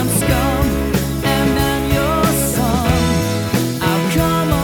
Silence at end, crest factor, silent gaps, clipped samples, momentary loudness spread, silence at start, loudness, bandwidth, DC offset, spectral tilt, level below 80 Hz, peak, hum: 0 s; 14 dB; none; under 0.1%; 3 LU; 0 s; -16 LUFS; over 20 kHz; under 0.1%; -5 dB/octave; -26 dBFS; -2 dBFS; none